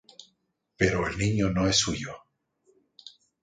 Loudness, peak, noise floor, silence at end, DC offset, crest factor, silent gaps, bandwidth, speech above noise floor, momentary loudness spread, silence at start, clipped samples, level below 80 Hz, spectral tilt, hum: -26 LUFS; -8 dBFS; -74 dBFS; 0.35 s; under 0.1%; 22 dB; none; 9.6 kHz; 49 dB; 24 LU; 0.2 s; under 0.1%; -46 dBFS; -4 dB/octave; none